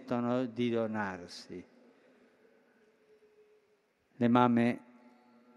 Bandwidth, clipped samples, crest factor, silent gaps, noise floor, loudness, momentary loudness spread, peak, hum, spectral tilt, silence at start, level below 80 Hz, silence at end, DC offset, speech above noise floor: 10 kHz; under 0.1%; 24 dB; none; -72 dBFS; -31 LUFS; 20 LU; -10 dBFS; none; -7.5 dB/octave; 0 s; -76 dBFS; 0.8 s; under 0.1%; 41 dB